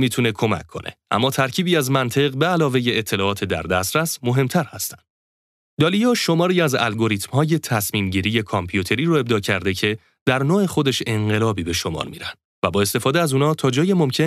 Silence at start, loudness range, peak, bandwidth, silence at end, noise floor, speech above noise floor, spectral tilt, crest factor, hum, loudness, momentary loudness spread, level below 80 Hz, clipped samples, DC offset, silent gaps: 0 s; 2 LU; -2 dBFS; 16 kHz; 0 s; under -90 dBFS; over 70 dB; -5 dB/octave; 18 dB; none; -20 LUFS; 7 LU; -52 dBFS; under 0.1%; under 0.1%; 5.10-5.77 s, 10.21-10.26 s, 12.45-12.62 s